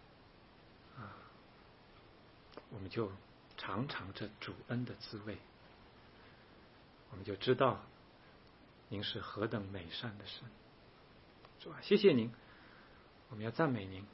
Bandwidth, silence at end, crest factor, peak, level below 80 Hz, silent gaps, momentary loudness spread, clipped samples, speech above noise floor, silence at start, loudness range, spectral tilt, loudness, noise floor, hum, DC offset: 5.8 kHz; 0 s; 26 dB; -16 dBFS; -70 dBFS; none; 28 LU; under 0.1%; 24 dB; 0 s; 11 LU; -4.5 dB/octave; -38 LUFS; -62 dBFS; none; under 0.1%